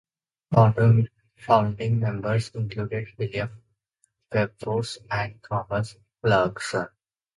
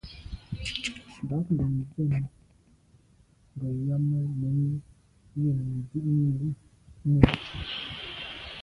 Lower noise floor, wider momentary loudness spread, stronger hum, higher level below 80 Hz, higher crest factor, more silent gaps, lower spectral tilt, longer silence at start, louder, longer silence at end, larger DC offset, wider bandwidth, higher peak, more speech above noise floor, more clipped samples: first, -71 dBFS vs -61 dBFS; about the same, 12 LU vs 14 LU; neither; second, -54 dBFS vs -44 dBFS; second, 22 dB vs 28 dB; neither; about the same, -7 dB/octave vs -7 dB/octave; first, 0.5 s vs 0.05 s; first, -25 LUFS vs -29 LUFS; first, 0.5 s vs 0 s; neither; about the same, 11.5 kHz vs 10.5 kHz; second, -4 dBFS vs 0 dBFS; first, 48 dB vs 34 dB; neither